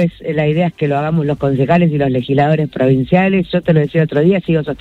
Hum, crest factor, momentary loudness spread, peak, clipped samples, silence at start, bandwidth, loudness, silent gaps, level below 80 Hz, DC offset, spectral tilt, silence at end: none; 12 dB; 4 LU; 0 dBFS; under 0.1%; 0 s; 4.5 kHz; -14 LUFS; none; -44 dBFS; under 0.1%; -9.5 dB/octave; 0.05 s